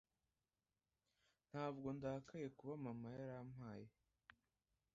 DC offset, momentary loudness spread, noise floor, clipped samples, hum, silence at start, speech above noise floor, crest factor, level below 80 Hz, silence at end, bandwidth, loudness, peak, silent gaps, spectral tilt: under 0.1%; 9 LU; under -90 dBFS; under 0.1%; none; 1.55 s; over 39 dB; 20 dB; -80 dBFS; 1.05 s; 7.4 kHz; -52 LUFS; -34 dBFS; none; -7.5 dB/octave